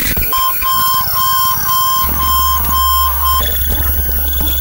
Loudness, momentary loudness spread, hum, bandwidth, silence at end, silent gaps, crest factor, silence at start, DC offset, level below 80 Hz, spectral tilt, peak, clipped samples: -11 LUFS; 2 LU; none; 16.5 kHz; 0 s; none; 10 dB; 0 s; under 0.1%; -22 dBFS; -2.5 dB/octave; -2 dBFS; under 0.1%